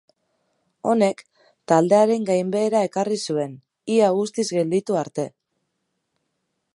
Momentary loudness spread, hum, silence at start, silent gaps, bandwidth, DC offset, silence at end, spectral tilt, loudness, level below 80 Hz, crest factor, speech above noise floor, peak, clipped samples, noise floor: 12 LU; none; 0.85 s; none; 11.5 kHz; under 0.1%; 1.45 s; -5.5 dB/octave; -21 LUFS; -74 dBFS; 20 dB; 56 dB; -4 dBFS; under 0.1%; -76 dBFS